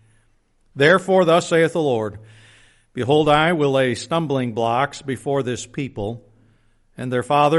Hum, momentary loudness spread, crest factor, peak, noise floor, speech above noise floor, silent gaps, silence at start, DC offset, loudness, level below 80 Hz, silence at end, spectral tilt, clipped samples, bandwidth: none; 14 LU; 18 dB; -2 dBFS; -60 dBFS; 41 dB; none; 0.75 s; under 0.1%; -19 LUFS; -52 dBFS; 0 s; -5.5 dB/octave; under 0.1%; 11.5 kHz